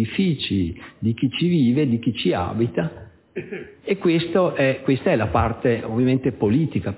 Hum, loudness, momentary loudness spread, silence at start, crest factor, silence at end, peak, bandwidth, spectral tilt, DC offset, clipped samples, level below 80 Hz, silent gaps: none; -21 LUFS; 10 LU; 0 s; 16 dB; 0 s; -6 dBFS; 4 kHz; -11.5 dB/octave; under 0.1%; under 0.1%; -42 dBFS; none